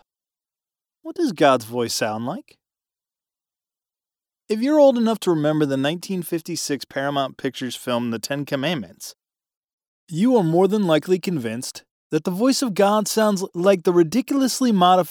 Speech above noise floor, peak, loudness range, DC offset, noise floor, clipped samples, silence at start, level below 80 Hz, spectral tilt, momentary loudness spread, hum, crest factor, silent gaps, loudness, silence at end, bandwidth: over 70 dB; -4 dBFS; 6 LU; under 0.1%; under -90 dBFS; under 0.1%; 1.05 s; -70 dBFS; -5 dB/octave; 12 LU; none; 18 dB; 9.57-9.62 s, 9.73-9.78 s, 9.87-10.07 s, 11.91-12.10 s; -21 LUFS; 0 s; over 20 kHz